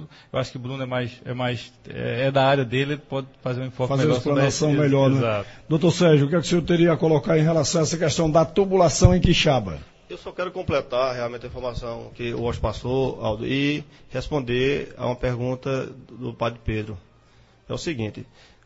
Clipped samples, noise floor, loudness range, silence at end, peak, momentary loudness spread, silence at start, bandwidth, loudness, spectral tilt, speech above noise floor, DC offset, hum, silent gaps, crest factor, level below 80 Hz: under 0.1%; -55 dBFS; 8 LU; 0.4 s; 0 dBFS; 14 LU; 0 s; 8 kHz; -23 LUFS; -5.5 dB/octave; 32 dB; under 0.1%; none; none; 22 dB; -38 dBFS